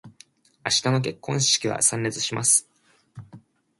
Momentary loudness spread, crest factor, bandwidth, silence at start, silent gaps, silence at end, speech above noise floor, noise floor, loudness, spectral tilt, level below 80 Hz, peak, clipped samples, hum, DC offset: 7 LU; 20 dB; 12 kHz; 0.05 s; none; 0.4 s; 32 dB; -55 dBFS; -21 LUFS; -2.5 dB/octave; -64 dBFS; -6 dBFS; under 0.1%; none; under 0.1%